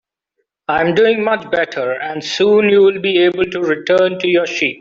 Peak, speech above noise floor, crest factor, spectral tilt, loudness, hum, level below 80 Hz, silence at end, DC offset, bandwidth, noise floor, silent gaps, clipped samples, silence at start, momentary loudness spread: -2 dBFS; 57 dB; 12 dB; -5 dB/octave; -14 LUFS; none; -56 dBFS; 0.05 s; under 0.1%; 7.6 kHz; -71 dBFS; none; under 0.1%; 0.7 s; 9 LU